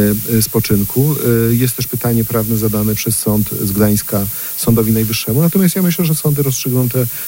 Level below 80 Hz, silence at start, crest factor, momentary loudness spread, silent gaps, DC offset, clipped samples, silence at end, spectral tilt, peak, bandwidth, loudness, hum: -38 dBFS; 0 s; 12 dB; 3 LU; none; under 0.1%; under 0.1%; 0 s; -5.5 dB/octave; -2 dBFS; 16.5 kHz; -14 LUFS; none